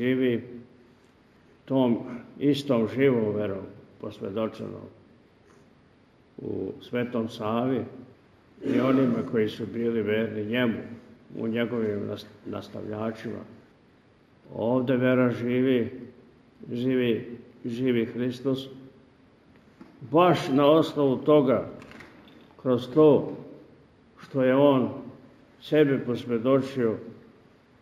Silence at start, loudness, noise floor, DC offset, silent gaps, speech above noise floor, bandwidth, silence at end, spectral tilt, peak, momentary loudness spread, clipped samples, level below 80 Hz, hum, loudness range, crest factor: 0 s; -26 LUFS; -59 dBFS; under 0.1%; none; 34 dB; 14 kHz; 0.65 s; -7.5 dB/octave; -6 dBFS; 20 LU; under 0.1%; -68 dBFS; none; 9 LU; 20 dB